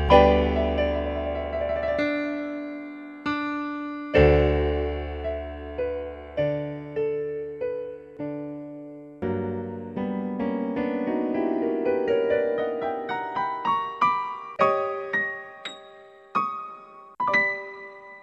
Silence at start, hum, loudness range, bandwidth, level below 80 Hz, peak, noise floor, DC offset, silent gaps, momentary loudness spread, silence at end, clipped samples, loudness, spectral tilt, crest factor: 0 s; none; 6 LU; 8.2 kHz; -38 dBFS; -2 dBFS; -48 dBFS; under 0.1%; none; 14 LU; 0 s; under 0.1%; -26 LUFS; -7.5 dB/octave; 24 dB